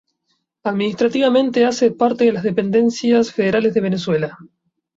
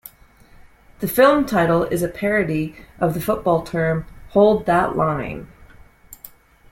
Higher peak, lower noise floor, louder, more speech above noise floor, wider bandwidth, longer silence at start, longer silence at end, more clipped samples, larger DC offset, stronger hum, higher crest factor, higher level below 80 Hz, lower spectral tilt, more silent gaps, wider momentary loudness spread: about the same, -4 dBFS vs -2 dBFS; first, -70 dBFS vs -49 dBFS; about the same, -17 LUFS vs -19 LUFS; first, 53 dB vs 31 dB; second, 7.8 kHz vs 16.5 kHz; about the same, 0.65 s vs 0.65 s; about the same, 0.5 s vs 0.45 s; neither; neither; neither; about the same, 14 dB vs 18 dB; second, -60 dBFS vs -44 dBFS; about the same, -6 dB/octave vs -6.5 dB/octave; neither; second, 6 LU vs 15 LU